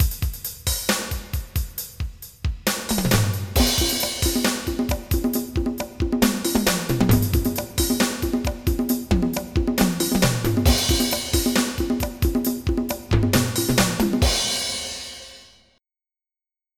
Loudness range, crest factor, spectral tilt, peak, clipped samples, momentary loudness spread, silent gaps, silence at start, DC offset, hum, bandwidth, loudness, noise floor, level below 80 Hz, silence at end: 2 LU; 18 dB; -4 dB/octave; -4 dBFS; under 0.1%; 9 LU; none; 0 s; under 0.1%; none; 19 kHz; -22 LUFS; under -90 dBFS; -30 dBFS; 1.35 s